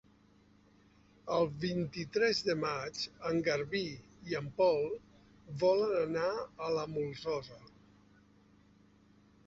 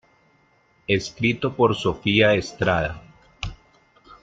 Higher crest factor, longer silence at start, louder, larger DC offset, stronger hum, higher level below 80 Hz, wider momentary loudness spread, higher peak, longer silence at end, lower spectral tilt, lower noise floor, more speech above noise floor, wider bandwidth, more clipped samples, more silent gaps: about the same, 18 dB vs 20 dB; first, 1.25 s vs 0.9 s; second, -34 LUFS vs -21 LUFS; neither; neither; second, -66 dBFS vs -46 dBFS; second, 10 LU vs 17 LU; second, -18 dBFS vs -4 dBFS; first, 1.8 s vs 0.1 s; second, -4 dB/octave vs -5.5 dB/octave; first, -65 dBFS vs -61 dBFS; second, 31 dB vs 40 dB; second, 7.6 kHz vs 9 kHz; neither; neither